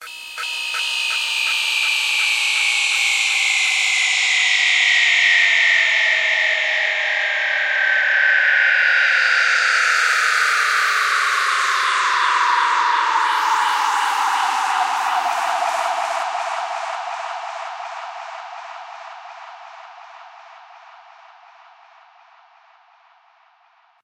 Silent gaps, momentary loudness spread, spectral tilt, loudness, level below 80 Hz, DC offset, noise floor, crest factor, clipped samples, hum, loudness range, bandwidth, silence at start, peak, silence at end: none; 16 LU; 4 dB/octave; -16 LUFS; -72 dBFS; under 0.1%; -57 dBFS; 16 dB; under 0.1%; none; 15 LU; 16 kHz; 0 s; -4 dBFS; 3.25 s